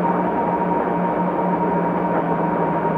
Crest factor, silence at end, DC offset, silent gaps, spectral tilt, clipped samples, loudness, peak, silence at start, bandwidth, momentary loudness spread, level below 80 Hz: 14 dB; 0 s; under 0.1%; none; -10 dB/octave; under 0.1%; -20 LUFS; -6 dBFS; 0 s; 4.1 kHz; 1 LU; -50 dBFS